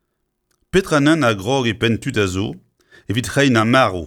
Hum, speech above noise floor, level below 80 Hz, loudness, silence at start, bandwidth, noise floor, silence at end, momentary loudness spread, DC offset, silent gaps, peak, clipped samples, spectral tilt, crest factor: none; 55 dB; -44 dBFS; -17 LUFS; 0.75 s; 17.5 kHz; -72 dBFS; 0 s; 10 LU; under 0.1%; none; -2 dBFS; under 0.1%; -5.5 dB/octave; 16 dB